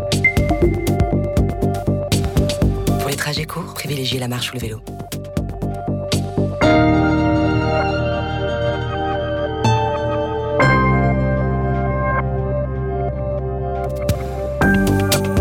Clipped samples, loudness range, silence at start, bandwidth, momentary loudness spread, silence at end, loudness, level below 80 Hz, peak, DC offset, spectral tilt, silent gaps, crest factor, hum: under 0.1%; 4 LU; 0 s; 17 kHz; 9 LU; 0 s; -19 LUFS; -28 dBFS; -6 dBFS; under 0.1%; -6 dB/octave; none; 12 dB; none